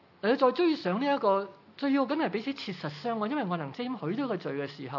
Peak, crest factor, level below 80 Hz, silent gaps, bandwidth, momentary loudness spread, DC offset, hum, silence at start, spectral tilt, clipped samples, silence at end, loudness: -12 dBFS; 18 dB; -86 dBFS; none; 6 kHz; 10 LU; under 0.1%; none; 0.25 s; -7.5 dB/octave; under 0.1%; 0 s; -30 LUFS